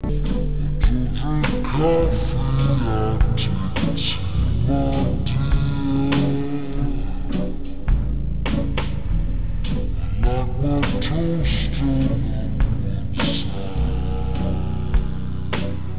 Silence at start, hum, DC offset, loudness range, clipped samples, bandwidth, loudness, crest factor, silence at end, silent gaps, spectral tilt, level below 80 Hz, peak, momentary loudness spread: 0 s; none; 5%; 4 LU; under 0.1%; 4 kHz; -23 LUFS; 16 dB; 0 s; none; -11 dB/octave; -24 dBFS; -6 dBFS; 6 LU